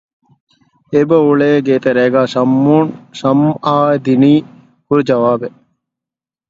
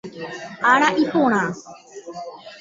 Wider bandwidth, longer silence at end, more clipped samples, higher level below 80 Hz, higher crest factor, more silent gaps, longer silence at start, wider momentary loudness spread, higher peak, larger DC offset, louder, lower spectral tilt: about the same, 7.6 kHz vs 7.8 kHz; first, 1 s vs 0 s; neither; first, -56 dBFS vs -64 dBFS; second, 14 dB vs 20 dB; neither; first, 0.9 s vs 0.05 s; second, 6 LU vs 21 LU; about the same, 0 dBFS vs -2 dBFS; neither; first, -12 LUFS vs -18 LUFS; first, -8 dB/octave vs -4.5 dB/octave